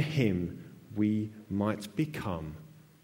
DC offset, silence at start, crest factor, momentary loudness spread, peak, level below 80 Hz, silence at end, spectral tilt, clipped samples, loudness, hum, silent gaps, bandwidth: under 0.1%; 0 s; 20 dB; 14 LU; -14 dBFS; -58 dBFS; 0.25 s; -7.5 dB/octave; under 0.1%; -33 LUFS; none; none; 16.5 kHz